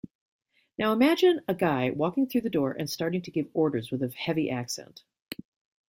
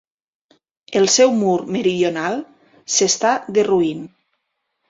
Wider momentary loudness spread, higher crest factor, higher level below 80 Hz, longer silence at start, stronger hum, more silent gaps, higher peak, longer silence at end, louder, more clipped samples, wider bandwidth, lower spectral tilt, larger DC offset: first, 16 LU vs 10 LU; about the same, 16 dB vs 16 dB; about the same, -66 dBFS vs -62 dBFS; about the same, 0.8 s vs 0.9 s; neither; first, 5.22-5.26 s vs none; second, -12 dBFS vs -2 dBFS; second, 0.55 s vs 0.8 s; second, -27 LUFS vs -17 LUFS; neither; first, 16.5 kHz vs 7.8 kHz; first, -5.5 dB/octave vs -3 dB/octave; neither